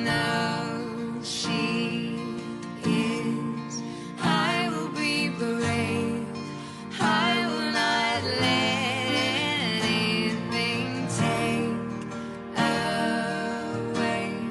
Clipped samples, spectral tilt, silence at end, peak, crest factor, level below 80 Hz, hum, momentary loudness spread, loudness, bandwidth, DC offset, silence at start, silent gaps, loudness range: under 0.1%; -4.5 dB/octave; 0 s; -10 dBFS; 16 dB; -60 dBFS; none; 10 LU; -26 LUFS; 12 kHz; under 0.1%; 0 s; none; 4 LU